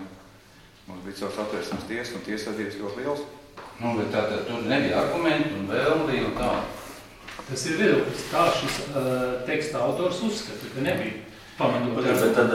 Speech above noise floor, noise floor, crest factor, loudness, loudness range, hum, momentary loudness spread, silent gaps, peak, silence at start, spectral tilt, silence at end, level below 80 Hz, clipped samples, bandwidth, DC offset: 26 dB; -52 dBFS; 18 dB; -26 LUFS; 7 LU; none; 17 LU; none; -8 dBFS; 0 s; -5 dB/octave; 0 s; -52 dBFS; under 0.1%; 16.5 kHz; under 0.1%